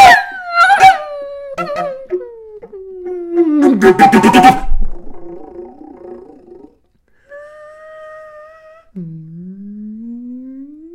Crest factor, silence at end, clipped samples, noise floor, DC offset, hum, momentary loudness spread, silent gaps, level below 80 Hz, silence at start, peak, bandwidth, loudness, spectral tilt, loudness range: 14 dB; 0.3 s; 0.9%; -54 dBFS; under 0.1%; none; 27 LU; none; -28 dBFS; 0 s; 0 dBFS; 16.5 kHz; -10 LUFS; -4.5 dB/octave; 22 LU